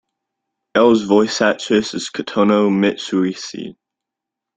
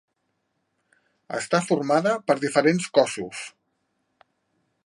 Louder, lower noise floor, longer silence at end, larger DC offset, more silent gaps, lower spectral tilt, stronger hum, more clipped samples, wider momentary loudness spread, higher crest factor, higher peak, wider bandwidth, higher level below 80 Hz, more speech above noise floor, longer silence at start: first, -16 LUFS vs -23 LUFS; first, -83 dBFS vs -75 dBFS; second, 0.85 s vs 1.35 s; neither; neither; about the same, -5 dB/octave vs -5 dB/octave; neither; neither; about the same, 13 LU vs 14 LU; second, 16 dB vs 22 dB; about the same, -2 dBFS vs -4 dBFS; second, 9.4 kHz vs 11.5 kHz; first, -58 dBFS vs -74 dBFS; first, 67 dB vs 52 dB; second, 0.75 s vs 1.3 s